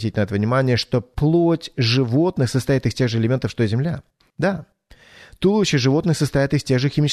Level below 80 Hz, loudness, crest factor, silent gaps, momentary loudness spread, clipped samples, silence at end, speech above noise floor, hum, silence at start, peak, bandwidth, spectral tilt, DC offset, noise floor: -44 dBFS; -20 LUFS; 14 dB; none; 6 LU; under 0.1%; 0 s; 29 dB; none; 0 s; -6 dBFS; 13.5 kHz; -6.5 dB/octave; under 0.1%; -48 dBFS